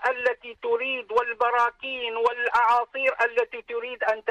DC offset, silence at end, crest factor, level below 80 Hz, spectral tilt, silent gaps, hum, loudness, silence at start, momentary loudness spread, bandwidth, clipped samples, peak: under 0.1%; 0 s; 12 dB; -66 dBFS; -2 dB/octave; none; none; -25 LUFS; 0 s; 8 LU; 9.8 kHz; under 0.1%; -12 dBFS